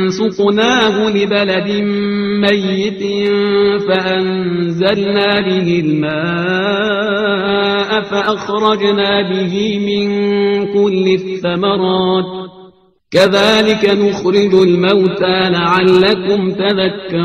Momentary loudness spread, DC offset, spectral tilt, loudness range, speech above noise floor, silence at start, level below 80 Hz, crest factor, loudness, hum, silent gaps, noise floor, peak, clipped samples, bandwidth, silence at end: 6 LU; under 0.1%; -6 dB/octave; 3 LU; 31 dB; 0 s; -50 dBFS; 12 dB; -13 LUFS; none; none; -44 dBFS; 0 dBFS; under 0.1%; 9.6 kHz; 0 s